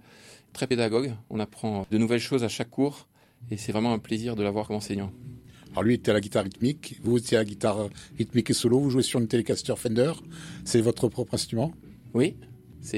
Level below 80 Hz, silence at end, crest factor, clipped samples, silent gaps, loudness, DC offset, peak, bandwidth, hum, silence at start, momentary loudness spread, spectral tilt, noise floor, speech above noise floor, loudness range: -58 dBFS; 0 s; 18 dB; under 0.1%; none; -27 LUFS; under 0.1%; -10 dBFS; 16 kHz; none; 0.25 s; 11 LU; -5.5 dB/octave; -52 dBFS; 26 dB; 3 LU